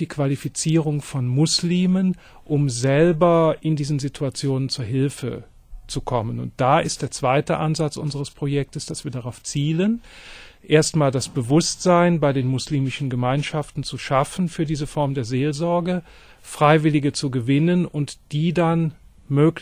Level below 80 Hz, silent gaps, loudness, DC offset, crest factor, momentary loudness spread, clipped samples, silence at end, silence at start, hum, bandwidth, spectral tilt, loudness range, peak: -46 dBFS; none; -21 LUFS; under 0.1%; 18 dB; 12 LU; under 0.1%; 0 s; 0 s; none; 15 kHz; -6 dB/octave; 4 LU; -2 dBFS